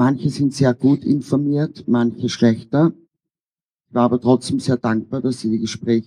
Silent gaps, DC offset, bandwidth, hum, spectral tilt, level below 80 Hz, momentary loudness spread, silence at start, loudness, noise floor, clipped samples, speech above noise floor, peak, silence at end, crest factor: 3.40-3.75 s; under 0.1%; 11 kHz; none; -7 dB/octave; -60 dBFS; 5 LU; 0 s; -19 LUFS; under -90 dBFS; under 0.1%; over 72 dB; -2 dBFS; 0.05 s; 16 dB